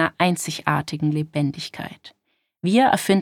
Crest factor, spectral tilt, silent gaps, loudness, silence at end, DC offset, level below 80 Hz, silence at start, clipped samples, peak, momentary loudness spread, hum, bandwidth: 20 dB; -5 dB/octave; none; -22 LUFS; 0 s; under 0.1%; -62 dBFS; 0 s; under 0.1%; -2 dBFS; 14 LU; none; 17.5 kHz